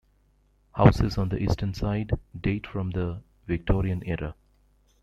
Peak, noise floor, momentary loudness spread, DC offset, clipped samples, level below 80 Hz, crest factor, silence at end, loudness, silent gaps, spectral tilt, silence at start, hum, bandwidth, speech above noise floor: -2 dBFS; -64 dBFS; 13 LU; under 0.1%; under 0.1%; -38 dBFS; 24 dB; 0.7 s; -27 LUFS; none; -8 dB/octave; 0.75 s; 50 Hz at -45 dBFS; 11.5 kHz; 39 dB